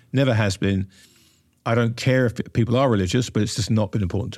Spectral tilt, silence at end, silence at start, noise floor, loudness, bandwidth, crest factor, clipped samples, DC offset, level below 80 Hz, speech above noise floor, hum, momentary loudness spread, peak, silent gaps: -6 dB/octave; 0 s; 0.15 s; -58 dBFS; -22 LUFS; 13 kHz; 14 dB; under 0.1%; under 0.1%; -48 dBFS; 38 dB; none; 5 LU; -8 dBFS; none